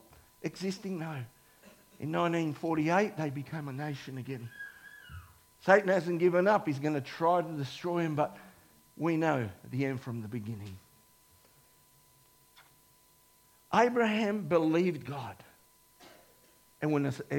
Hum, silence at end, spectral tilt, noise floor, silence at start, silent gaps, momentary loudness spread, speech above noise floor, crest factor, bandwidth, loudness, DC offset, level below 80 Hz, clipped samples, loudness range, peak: none; 0 s; -6.5 dB/octave; -64 dBFS; 0.4 s; none; 18 LU; 34 dB; 24 dB; 17.5 kHz; -31 LUFS; under 0.1%; -70 dBFS; under 0.1%; 8 LU; -10 dBFS